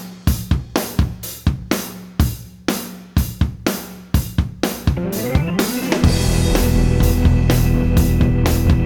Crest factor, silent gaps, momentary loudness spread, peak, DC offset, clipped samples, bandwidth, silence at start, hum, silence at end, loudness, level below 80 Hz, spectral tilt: 14 dB; none; 8 LU; -4 dBFS; under 0.1%; under 0.1%; over 20 kHz; 0 s; none; 0 s; -19 LUFS; -22 dBFS; -6 dB/octave